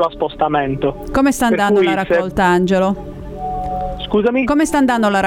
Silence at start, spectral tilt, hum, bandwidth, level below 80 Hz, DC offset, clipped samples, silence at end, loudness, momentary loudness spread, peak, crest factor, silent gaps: 0 s; -5.5 dB/octave; none; 17 kHz; -34 dBFS; under 0.1%; under 0.1%; 0 s; -16 LUFS; 10 LU; -2 dBFS; 14 dB; none